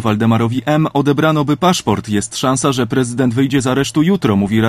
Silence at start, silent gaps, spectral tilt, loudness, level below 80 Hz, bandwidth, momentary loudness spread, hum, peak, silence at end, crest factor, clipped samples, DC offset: 0 s; none; -5.5 dB/octave; -15 LUFS; -44 dBFS; 15.5 kHz; 3 LU; none; 0 dBFS; 0 s; 14 dB; under 0.1%; under 0.1%